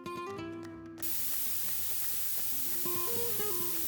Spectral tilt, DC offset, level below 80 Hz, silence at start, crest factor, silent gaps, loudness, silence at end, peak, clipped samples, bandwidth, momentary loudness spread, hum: -2 dB/octave; under 0.1%; -66 dBFS; 0 s; 16 dB; none; -30 LUFS; 0 s; -18 dBFS; under 0.1%; 19.5 kHz; 12 LU; none